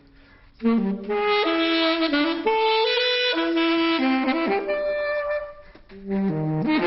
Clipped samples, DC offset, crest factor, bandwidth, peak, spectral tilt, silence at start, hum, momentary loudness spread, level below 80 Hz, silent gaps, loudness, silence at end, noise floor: under 0.1%; under 0.1%; 14 dB; 6 kHz; -10 dBFS; -3 dB/octave; 0.6 s; none; 6 LU; -54 dBFS; none; -22 LUFS; 0 s; -51 dBFS